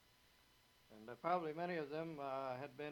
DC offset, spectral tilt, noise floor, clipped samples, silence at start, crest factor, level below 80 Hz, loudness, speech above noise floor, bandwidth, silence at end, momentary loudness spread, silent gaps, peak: under 0.1%; -7 dB/octave; -72 dBFS; under 0.1%; 0.9 s; 20 dB; -82 dBFS; -44 LUFS; 28 dB; 18.5 kHz; 0 s; 9 LU; none; -26 dBFS